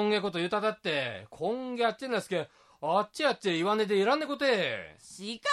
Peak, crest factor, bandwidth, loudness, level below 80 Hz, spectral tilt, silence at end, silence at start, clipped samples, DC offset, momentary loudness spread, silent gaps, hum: -14 dBFS; 16 dB; 13.5 kHz; -30 LUFS; -74 dBFS; -4.5 dB/octave; 0 s; 0 s; under 0.1%; under 0.1%; 11 LU; none; none